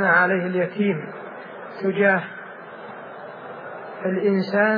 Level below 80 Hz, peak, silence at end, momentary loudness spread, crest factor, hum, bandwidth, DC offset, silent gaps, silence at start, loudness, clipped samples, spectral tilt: -86 dBFS; -4 dBFS; 0 s; 18 LU; 18 dB; none; 5 kHz; under 0.1%; none; 0 s; -21 LUFS; under 0.1%; -9 dB/octave